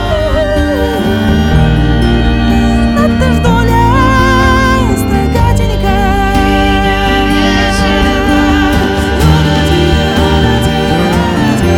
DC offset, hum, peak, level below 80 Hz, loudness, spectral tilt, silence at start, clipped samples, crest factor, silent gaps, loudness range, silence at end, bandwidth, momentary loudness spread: under 0.1%; none; 0 dBFS; -16 dBFS; -10 LUFS; -6 dB/octave; 0 s; under 0.1%; 8 dB; none; 1 LU; 0 s; 17 kHz; 4 LU